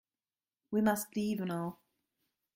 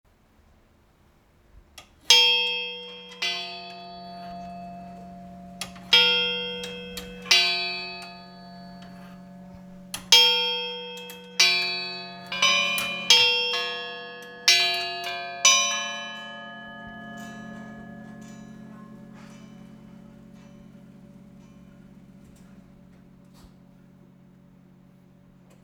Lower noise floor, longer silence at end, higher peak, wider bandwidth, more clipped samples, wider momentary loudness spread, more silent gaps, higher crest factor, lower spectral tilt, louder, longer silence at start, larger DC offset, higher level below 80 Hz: first, under -90 dBFS vs -60 dBFS; second, 0.8 s vs 3.05 s; second, -16 dBFS vs -2 dBFS; second, 16.5 kHz vs 19.5 kHz; neither; second, 8 LU vs 27 LU; neither; second, 20 dB vs 26 dB; first, -5.5 dB/octave vs 0 dB/octave; second, -35 LUFS vs -20 LUFS; second, 0.7 s vs 1.75 s; neither; second, -72 dBFS vs -62 dBFS